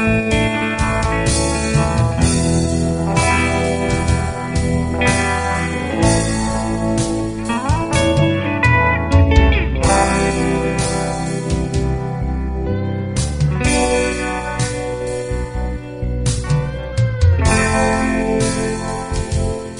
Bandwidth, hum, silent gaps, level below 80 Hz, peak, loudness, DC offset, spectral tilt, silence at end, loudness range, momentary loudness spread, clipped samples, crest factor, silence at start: 11 kHz; none; none; -24 dBFS; 0 dBFS; -17 LUFS; 0.4%; -5 dB/octave; 0 s; 4 LU; 8 LU; under 0.1%; 16 dB; 0 s